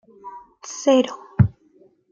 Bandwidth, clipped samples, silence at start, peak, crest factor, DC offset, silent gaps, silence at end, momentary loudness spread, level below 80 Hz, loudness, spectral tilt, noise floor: 7.6 kHz; under 0.1%; 0.25 s; -2 dBFS; 20 dB; under 0.1%; none; 0.65 s; 22 LU; -46 dBFS; -20 LUFS; -6.5 dB/octave; -56 dBFS